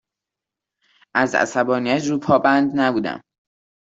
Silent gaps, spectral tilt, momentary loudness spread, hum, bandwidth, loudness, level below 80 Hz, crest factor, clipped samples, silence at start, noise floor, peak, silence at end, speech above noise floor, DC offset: none; -5 dB/octave; 9 LU; none; 8 kHz; -19 LUFS; -62 dBFS; 18 dB; under 0.1%; 1.15 s; -86 dBFS; -2 dBFS; 0.7 s; 68 dB; under 0.1%